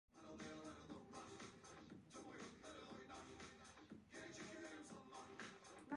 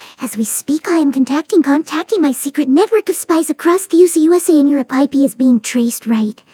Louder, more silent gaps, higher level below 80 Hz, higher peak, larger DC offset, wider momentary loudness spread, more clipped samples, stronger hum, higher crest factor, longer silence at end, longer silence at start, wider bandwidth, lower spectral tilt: second, -58 LUFS vs -13 LUFS; neither; second, -78 dBFS vs -68 dBFS; second, -34 dBFS vs 0 dBFS; neither; about the same, 6 LU vs 7 LU; neither; neither; first, 22 dB vs 14 dB; second, 0 s vs 0.2 s; about the same, 0.1 s vs 0 s; second, 11 kHz vs 18 kHz; about the same, -4 dB/octave vs -4 dB/octave